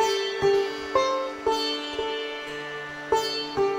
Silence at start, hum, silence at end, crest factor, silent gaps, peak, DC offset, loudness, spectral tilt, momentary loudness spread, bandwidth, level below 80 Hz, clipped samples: 0 s; none; 0 s; 18 dB; none; -8 dBFS; under 0.1%; -26 LUFS; -3 dB/octave; 10 LU; 16 kHz; -56 dBFS; under 0.1%